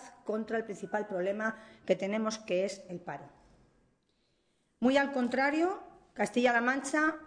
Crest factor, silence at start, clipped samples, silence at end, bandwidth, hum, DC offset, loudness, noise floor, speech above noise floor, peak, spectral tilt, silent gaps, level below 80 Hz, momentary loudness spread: 20 dB; 0 s; under 0.1%; 0 s; 10 kHz; none; under 0.1%; -31 LUFS; -75 dBFS; 43 dB; -14 dBFS; -4.5 dB/octave; none; -72 dBFS; 15 LU